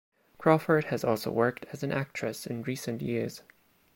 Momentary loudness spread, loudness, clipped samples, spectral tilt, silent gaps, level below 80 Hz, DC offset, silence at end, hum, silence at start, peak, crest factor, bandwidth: 10 LU; -30 LUFS; under 0.1%; -6 dB/octave; none; -66 dBFS; under 0.1%; 0.55 s; none; 0.4 s; -8 dBFS; 22 dB; 16.5 kHz